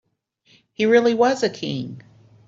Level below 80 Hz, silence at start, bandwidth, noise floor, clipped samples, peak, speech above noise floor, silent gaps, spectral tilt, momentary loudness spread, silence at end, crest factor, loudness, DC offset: -66 dBFS; 0.8 s; 7.8 kHz; -62 dBFS; under 0.1%; -4 dBFS; 43 dB; none; -5 dB/octave; 13 LU; 0.5 s; 18 dB; -20 LUFS; under 0.1%